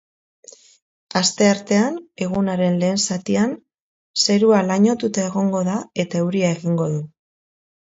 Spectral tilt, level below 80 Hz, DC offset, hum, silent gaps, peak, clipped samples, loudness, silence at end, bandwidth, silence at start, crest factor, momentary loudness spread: -5 dB/octave; -60 dBFS; under 0.1%; none; 3.80-4.14 s; -2 dBFS; under 0.1%; -19 LUFS; 0.85 s; 8 kHz; 1.15 s; 18 dB; 9 LU